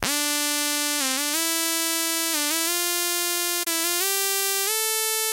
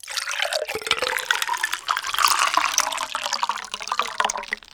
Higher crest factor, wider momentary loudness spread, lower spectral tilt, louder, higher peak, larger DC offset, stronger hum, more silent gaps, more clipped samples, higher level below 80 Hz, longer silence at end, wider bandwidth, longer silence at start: about the same, 20 dB vs 24 dB; second, 1 LU vs 7 LU; about the same, 0.5 dB/octave vs 1.5 dB/octave; about the same, -22 LUFS vs -23 LUFS; second, -4 dBFS vs 0 dBFS; neither; neither; neither; neither; about the same, -64 dBFS vs -60 dBFS; second, 0 s vs 0.15 s; second, 16 kHz vs over 20 kHz; about the same, 0 s vs 0.05 s